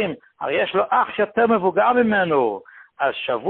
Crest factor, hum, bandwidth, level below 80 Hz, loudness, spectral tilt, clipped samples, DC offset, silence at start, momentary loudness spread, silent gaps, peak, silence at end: 16 dB; none; 4.3 kHz; -60 dBFS; -20 LUFS; -10 dB/octave; under 0.1%; under 0.1%; 0 s; 8 LU; none; -4 dBFS; 0 s